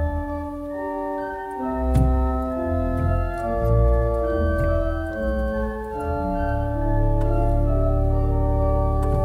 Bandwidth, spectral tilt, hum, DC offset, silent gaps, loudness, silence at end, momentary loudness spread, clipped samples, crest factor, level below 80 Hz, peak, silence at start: 11.5 kHz; -9.5 dB/octave; none; under 0.1%; none; -23 LUFS; 0 s; 8 LU; under 0.1%; 14 dB; -24 dBFS; -6 dBFS; 0 s